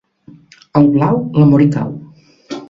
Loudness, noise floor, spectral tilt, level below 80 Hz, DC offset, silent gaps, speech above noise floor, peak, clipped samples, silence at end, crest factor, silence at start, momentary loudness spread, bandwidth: -13 LUFS; -43 dBFS; -9.5 dB/octave; -48 dBFS; under 0.1%; none; 32 dB; 0 dBFS; under 0.1%; 0.05 s; 14 dB; 0.75 s; 17 LU; 7.6 kHz